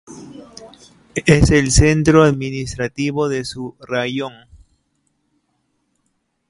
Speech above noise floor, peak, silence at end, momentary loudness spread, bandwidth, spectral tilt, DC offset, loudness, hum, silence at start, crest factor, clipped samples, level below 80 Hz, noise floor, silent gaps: 53 dB; 0 dBFS; 2.2 s; 20 LU; 11.5 kHz; -5.5 dB/octave; under 0.1%; -16 LUFS; none; 0.1 s; 18 dB; under 0.1%; -30 dBFS; -69 dBFS; none